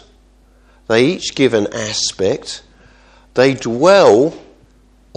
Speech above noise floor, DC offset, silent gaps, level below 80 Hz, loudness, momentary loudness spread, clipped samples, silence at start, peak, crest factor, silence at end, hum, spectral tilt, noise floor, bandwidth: 36 dB; under 0.1%; none; -50 dBFS; -14 LUFS; 13 LU; under 0.1%; 0.9 s; 0 dBFS; 16 dB; 0.8 s; none; -4 dB/octave; -49 dBFS; 10.5 kHz